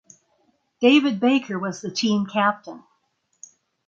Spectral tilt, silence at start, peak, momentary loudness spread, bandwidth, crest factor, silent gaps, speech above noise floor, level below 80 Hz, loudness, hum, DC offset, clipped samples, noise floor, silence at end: -4.5 dB/octave; 0.8 s; -4 dBFS; 12 LU; 7.6 kHz; 20 dB; none; 50 dB; -70 dBFS; -21 LUFS; none; under 0.1%; under 0.1%; -70 dBFS; 1.1 s